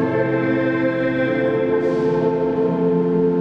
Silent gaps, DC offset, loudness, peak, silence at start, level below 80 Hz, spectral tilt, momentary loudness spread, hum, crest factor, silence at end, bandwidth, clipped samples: none; under 0.1%; -19 LUFS; -8 dBFS; 0 s; -50 dBFS; -9 dB/octave; 1 LU; none; 10 dB; 0 s; 6.4 kHz; under 0.1%